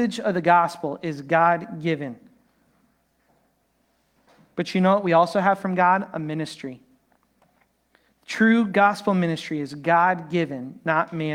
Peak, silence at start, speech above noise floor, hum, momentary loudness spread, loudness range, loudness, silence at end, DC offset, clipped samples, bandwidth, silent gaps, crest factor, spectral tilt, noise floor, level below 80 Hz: -4 dBFS; 0 s; 46 dB; none; 12 LU; 5 LU; -22 LUFS; 0 s; under 0.1%; under 0.1%; 12.5 kHz; none; 20 dB; -6.5 dB/octave; -68 dBFS; -70 dBFS